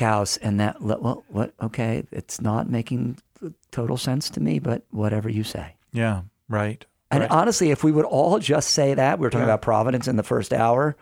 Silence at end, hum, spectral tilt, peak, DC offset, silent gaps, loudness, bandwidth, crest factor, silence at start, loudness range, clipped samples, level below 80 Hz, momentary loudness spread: 0.1 s; none; -5.5 dB/octave; -4 dBFS; under 0.1%; none; -23 LUFS; 16.5 kHz; 18 dB; 0 s; 7 LU; under 0.1%; -52 dBFS; 11 LU